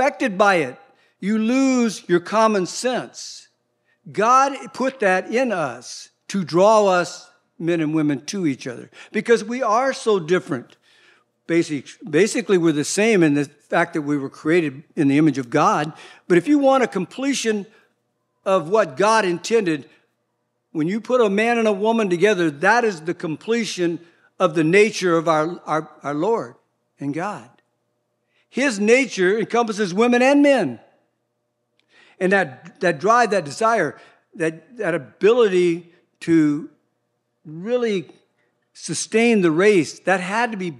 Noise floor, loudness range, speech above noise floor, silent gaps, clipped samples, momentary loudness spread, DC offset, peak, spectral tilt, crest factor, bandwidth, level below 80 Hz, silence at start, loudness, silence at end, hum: -73 dBFS; 3 LU; 54 dB; none; under 0.1%; 12 LU; under 0.1%; 0 dBFS; -5 dB/octave; 20 dB; 12.5 kHz; -78 dBFS; 0 s; -19 LUFS; 0 s; none